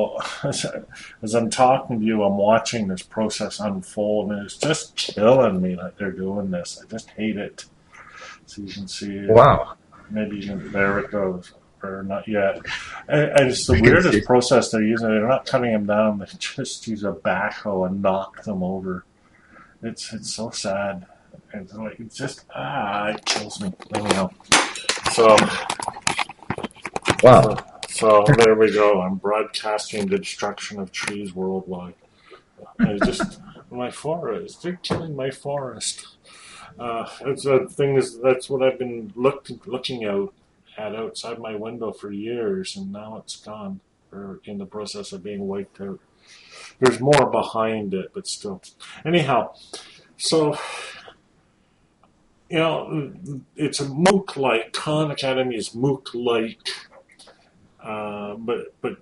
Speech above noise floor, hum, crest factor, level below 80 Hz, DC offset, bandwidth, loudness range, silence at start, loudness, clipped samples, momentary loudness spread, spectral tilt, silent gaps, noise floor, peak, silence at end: 40 dB; none; 22 dB; -48 dBFS; under 0.1%; 11.5 kHz; 12 LU; 0 s; -21 LUFS; under 0.1%; 19 LU; -5 dB/octave; none; -61 dBFS; 0 dBFS; 0.05 s